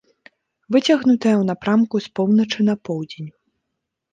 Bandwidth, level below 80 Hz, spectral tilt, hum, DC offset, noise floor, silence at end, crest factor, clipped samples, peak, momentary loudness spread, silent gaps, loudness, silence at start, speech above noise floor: 7.6 kHz; -64 dBFS; -6.5 dB/octave; none; under 0.1%; -79 dBFS; 0.85 s; 16 dB; under 0.1%; -4 dBFS; 13 LU; none; -19 LUFS; 0.7 s; 61 dB